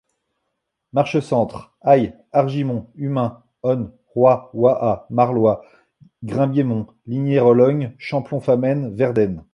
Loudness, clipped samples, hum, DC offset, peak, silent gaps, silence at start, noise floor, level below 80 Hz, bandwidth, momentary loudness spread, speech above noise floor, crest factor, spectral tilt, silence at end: -19 LUFS; under 0.1%; none; under 0.1%; -2 dBFS; none; 0.95 s; -76 dBFS; -54 dBFS; 9.8 kHz; 10 LU; 58 dB; 18 dB; -9 dB/octave; 0.15 s